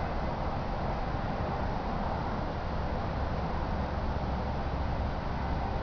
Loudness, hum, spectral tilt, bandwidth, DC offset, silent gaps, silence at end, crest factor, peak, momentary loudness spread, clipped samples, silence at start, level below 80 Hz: -34 LUFS; none; -8 dB/octave; 5.4 kHz; 0.2%; none; 0 s; 12 dB; -20 dBFS; 1 LU; under 0.1%; 0 s; -36 dBFS